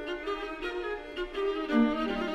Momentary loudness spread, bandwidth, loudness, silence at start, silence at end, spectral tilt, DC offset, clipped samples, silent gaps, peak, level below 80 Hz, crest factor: 10 LU; 9.2 kHz; -31 LUFS; 0 s; 0 s; -5.5 dB/octave; under 0.1%; under 0.1%; none; -14 dBFS; -50 dBFS; 16 dB